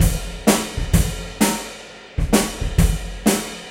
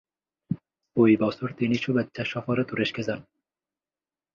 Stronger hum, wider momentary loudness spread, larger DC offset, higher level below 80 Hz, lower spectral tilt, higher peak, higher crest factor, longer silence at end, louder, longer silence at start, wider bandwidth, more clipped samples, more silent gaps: neither; second, 9 LU vs 14 LU; neither; first, -26 dBFS vs -62 dBFS; second, -4.5 dB/octave vs -7 dB/octave; first, -2 dBFS vs -8 dBFS; about the same, 18 dB vs 20 dB; second, 0 s vs 1.15 s; first, -20 LUFS vs -26 LUFS; second, 0 s vs 0.5 s; first, 16 kHz vs 7.2 kHz; neither; neither